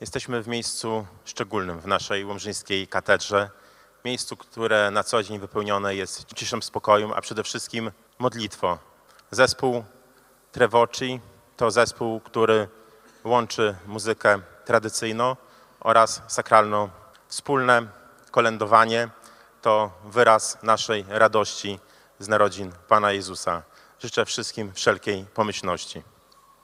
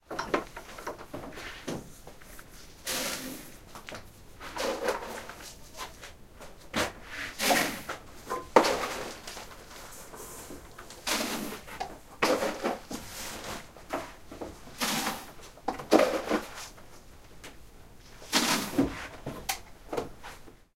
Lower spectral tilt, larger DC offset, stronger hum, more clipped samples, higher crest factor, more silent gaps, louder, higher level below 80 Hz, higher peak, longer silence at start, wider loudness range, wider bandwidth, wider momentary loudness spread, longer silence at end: about the same, -3.5 dB/octave vs -2.5 dB/octave; neither; neither; neither; second, 24 dB vs 30 dB; neither; first, -23 LUFS vs -32 LUFS; second, -62 dBFS vs -54 dBFS; first, 0 dBFS vs -4 dBFS; about the same, 0 s vs 0.05 s; second, 5 LU vs 8 LU; about the same, 15.5 kHz vs 16 kHz; second, 13 LU vs 23 LU; first, 0.65 s vs 0.2 s